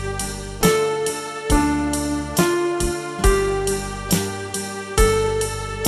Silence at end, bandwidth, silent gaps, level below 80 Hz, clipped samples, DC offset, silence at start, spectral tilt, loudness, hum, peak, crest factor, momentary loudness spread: 0 s; 15.5 kHz; none; -28 dBFS; under 0.1%; under 0.1%; 0 s; -4.5 dB/octave; -21 LUFS; none; -2 dBFS; 18 dB; 8 LU